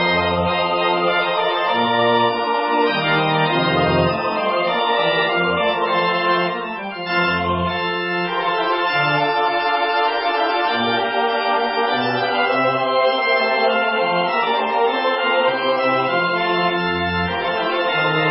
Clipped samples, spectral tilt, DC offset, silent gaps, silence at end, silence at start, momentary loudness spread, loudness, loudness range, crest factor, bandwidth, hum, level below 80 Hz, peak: under 0.1%; -9.5 dB/octave; under 0.1%; none; 0 s; 0 s; 3 LU; -18 LUFS; 2 LU; 14 dB; 5.8 kHz; none; -46 dBFS; -4 dBFS